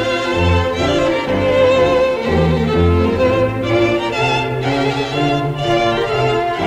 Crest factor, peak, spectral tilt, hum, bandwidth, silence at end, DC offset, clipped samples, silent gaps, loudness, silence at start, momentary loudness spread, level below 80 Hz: 12 dB; -2 dBFS; -6.5 dB/octave; none; 13.5 kHz; 0 s; under 0.1%; under 0.1%; none; -15 LUFS; 0 s; 4 LU; -36 dBFS